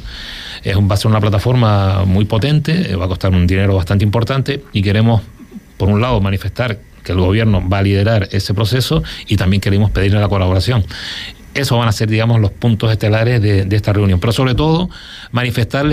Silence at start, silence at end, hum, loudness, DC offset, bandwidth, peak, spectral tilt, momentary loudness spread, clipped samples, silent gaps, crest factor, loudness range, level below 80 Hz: 0 s; 0 s; none; -15 LUFS; under 0.1%; 15 kHz; -4 dBFS; -7 dB/octave; 7 LU; under 0.1%; none; 10 dB; 2 LU; -32 dBFS